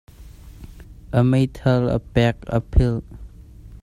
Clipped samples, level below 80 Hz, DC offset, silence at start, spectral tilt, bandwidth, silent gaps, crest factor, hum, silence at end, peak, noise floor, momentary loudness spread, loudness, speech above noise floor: under 0.1%; -30 dBFS; under 0.1%; 0.2 s; -8 dB/octave; 11.5 kHz; none; 20 dB; none; 0.05 s; -2 dBFS; -41 dBFS; 10 LU; -20 LUFS; 23 dB